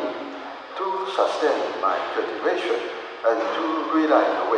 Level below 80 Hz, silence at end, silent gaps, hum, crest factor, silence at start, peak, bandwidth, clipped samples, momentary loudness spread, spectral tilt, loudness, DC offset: -74 dBFS; 0 s; none; none; 20 dB; 0 s; -4 dBFS; 10 kHz; under 0.1%; 12 LU; -3.5 dB/octave; -23 LUFS; under 0.1%